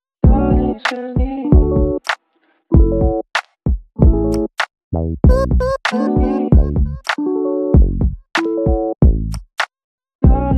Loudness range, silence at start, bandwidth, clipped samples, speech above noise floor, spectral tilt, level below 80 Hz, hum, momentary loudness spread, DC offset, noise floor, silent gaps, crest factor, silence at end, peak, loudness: 2 LU; 0.25 s; 9.6 kHz; under 0.1%; 46 dB; -7.5 dB/octave; -18 dBFS; none; 9 LU; under 0.1%; -61 dBFS; 4.84-4.91 s, 9.84-9.98 s, 10.15-10.19 s; 14 dB; 0 s; 0 dBFS; -17 LUFS